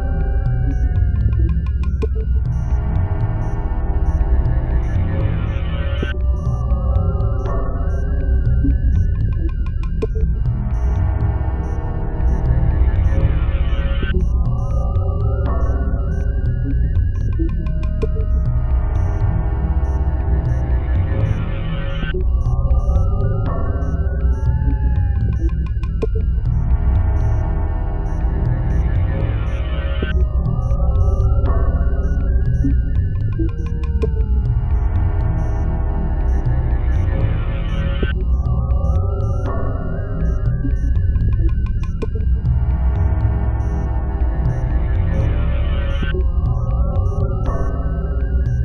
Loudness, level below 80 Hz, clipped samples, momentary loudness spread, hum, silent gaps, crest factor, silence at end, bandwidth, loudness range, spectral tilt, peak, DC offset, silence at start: -20 LUFS; -18 dBFS; under 0.1%; 4 LU; none; none; 14 dB; 0 s; 3.7 kHz; 1 LU; -9 dB/octave; -2 dBFS; 0.3%; 0 s